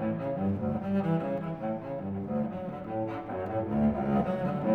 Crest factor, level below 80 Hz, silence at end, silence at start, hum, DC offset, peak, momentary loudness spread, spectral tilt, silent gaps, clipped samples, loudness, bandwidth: 14 dB; -54 dBFS; 0 s; 0 s; none; under 0.1%; -16 dBFS; 7 LU; -10.5 dB/octave; none; under 0.1%; -31 LUFS; 4.7 kHz